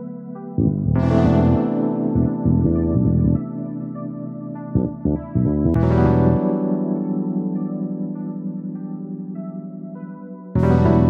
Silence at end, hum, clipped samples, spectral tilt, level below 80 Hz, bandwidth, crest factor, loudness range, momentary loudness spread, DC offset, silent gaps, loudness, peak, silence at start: 0 s; none; under 0.1%; -11 dB/octave; -34 dBFS; 6 kHz; 16 dB; 8 LU; 15 LU; under 0.1%; none; -20 LUFS; -2 dBFS; 0 s